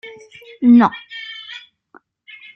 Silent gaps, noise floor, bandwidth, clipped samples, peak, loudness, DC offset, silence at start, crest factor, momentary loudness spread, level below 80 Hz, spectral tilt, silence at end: none; -51 dBFS; 6 kHz; under 0.1%; -2 dBFS; -13 LUFS; under 0.1%; 0.05 s; 16 dB; 24 LU; -64 dBFS; -7 dB/octave; 1 s